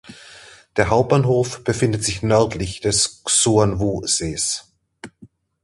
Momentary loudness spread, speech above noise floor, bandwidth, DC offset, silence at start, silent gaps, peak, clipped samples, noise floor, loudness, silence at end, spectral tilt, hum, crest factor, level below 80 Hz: 6 LU; 31 dB; 11.5 kHz; under 0.1%; 0.1 s; none; -2 dBFS; under 0.1%; -49 dBFS; -19 LUFS; 0.35 s; -4 dB/octave; none; 18 dB; -42 dBFS